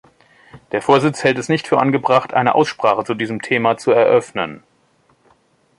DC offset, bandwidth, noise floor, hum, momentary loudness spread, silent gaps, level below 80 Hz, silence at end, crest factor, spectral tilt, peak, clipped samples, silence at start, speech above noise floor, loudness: under 0.1%; 11.5 kHz; -58 dBFS; none; 8 LU; none; -60 dBFS; 1.2 s; 16 dB; -5.5 dB/octave; -2 dBFS; under 0.1%; 0.55 s; 42 dB; -16 LUFS